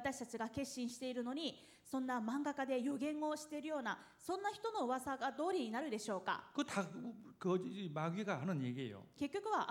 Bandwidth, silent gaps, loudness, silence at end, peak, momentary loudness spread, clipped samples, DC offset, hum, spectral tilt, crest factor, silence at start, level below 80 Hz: 18 kHz; none; -42 LUFS; 0 s; -24 dBFS; 6 LU; under 0.1%; under 0.1%; none; -5 dB/octave; 18 dB; 0 s; -78 dBFS